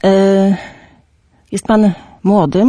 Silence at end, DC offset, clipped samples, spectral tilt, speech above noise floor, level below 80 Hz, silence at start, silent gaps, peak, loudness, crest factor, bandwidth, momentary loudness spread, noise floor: 0 s; under 0.1%; under 0.1%; -7 dB/octave; 42 dB; -46 dBFS; 0 s; none; -2 dBFS; -13 LUFS; 12 dB; 11 kHz; 13 LU; -53 dBFS